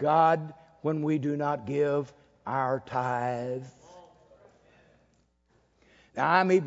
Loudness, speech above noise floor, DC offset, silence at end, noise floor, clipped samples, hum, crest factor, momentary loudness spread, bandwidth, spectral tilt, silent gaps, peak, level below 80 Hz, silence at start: -28 LUFS; 41 dB; under 0.1%; 0 s; -68 dBFS; under 0.1%; none; 20 dB; 18 LU; 7.8 kHz; -7 dB/octave; none; -8 dBFS; -70 dBFS; 0 s